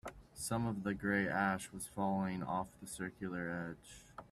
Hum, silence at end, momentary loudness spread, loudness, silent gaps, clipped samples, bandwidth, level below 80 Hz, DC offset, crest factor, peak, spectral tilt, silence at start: none; 0.05 s; 13 LU; -39 LUFS; none; under 0.1%; 14.5 kHz; -64 dBFS; under 0.1%; 18 dB; -20 dBFS; -5.5 dB/octave; 0.05 s